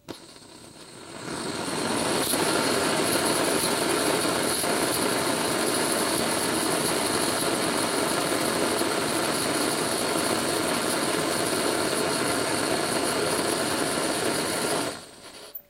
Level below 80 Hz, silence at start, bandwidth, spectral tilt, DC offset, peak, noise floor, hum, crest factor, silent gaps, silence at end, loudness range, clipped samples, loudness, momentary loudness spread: -58 dBFS; 0.05 s; 16 kHz; -2.5 dB/octave; under 0.1%; -10 dBFS; -47 dBFS; none; 16 dB; none; 0.1 s; 2 LU; under 0.1%; -24 LUFS; 7 LU